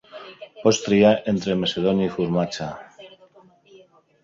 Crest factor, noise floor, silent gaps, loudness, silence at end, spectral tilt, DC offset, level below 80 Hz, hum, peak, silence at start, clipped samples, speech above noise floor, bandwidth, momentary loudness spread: 20 dB; -53 dBFS; none; -21 LUFS; 1.15 s; -5.5 dB/octave; under 0.1%; -56 dBFS; none; -4 dBFS; 0.15 s; under 0.1%; 33 dB; 7.8 kHz; 23 LU